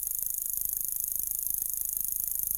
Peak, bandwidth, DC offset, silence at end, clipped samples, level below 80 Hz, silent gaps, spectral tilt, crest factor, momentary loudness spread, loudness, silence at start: -12 dBFS; over 20 kHz; under 0.1%; 0 s; under 0.1%; -56 dBFS; none; 0 dB/octave; 20 dB; 1 LU; -29 LUFS; 0 s